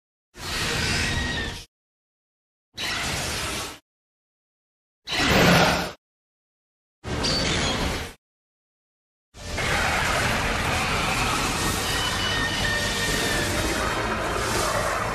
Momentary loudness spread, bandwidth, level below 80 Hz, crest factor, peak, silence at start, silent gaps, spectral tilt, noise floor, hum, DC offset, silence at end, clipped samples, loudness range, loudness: 12 LU; 15 kHz; -38 dBFS; 22 dB; -4 dBFS; 0.35 s; 1.68-2.72 s, 3.82-5.02 s, 5.98-7.02 s, 8.18-9.32 s; -3 dB/octave; under -90 dBFS; none; under 0.1%; 0 s; under 0.1%; 6 LU; -23 LUFS